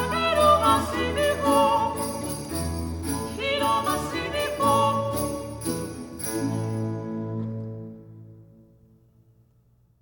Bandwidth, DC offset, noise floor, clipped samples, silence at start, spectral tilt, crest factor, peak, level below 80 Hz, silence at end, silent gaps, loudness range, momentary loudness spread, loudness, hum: 19.5 kHz; under 0.1%; -61 dBFS; under 0.1%; 0 s; -4.5 dB/octave; 20 dB; -6 dBFS; -44 dBFS; 1.55 s; none; 10 LU; 12 LU; -25 LUFS; none